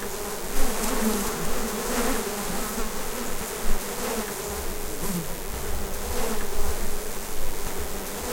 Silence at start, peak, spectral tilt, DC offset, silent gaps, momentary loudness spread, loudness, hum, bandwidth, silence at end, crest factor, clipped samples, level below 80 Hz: 0 s; -8 dBFS; -3.5 dB/octave; under 0.1%; none; 7 LU; -29 LUFS; none; 17 kHz; 0 s; 16 dB; under 0.1%; -30 dBFS